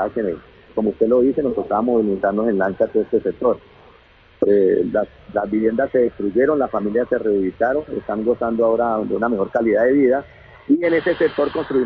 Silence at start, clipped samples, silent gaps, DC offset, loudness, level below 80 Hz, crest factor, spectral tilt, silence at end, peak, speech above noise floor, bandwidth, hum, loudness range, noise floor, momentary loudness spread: 0 s; under 0.1%; none; under 0.1%; -19 LUFS; -50 dBFS; 16 dB; -9.5 dB/octave; 0 s; -4 dBFS; 32 dB; 5 kHz; none; 2 LU; -50 dBFS; 7 LU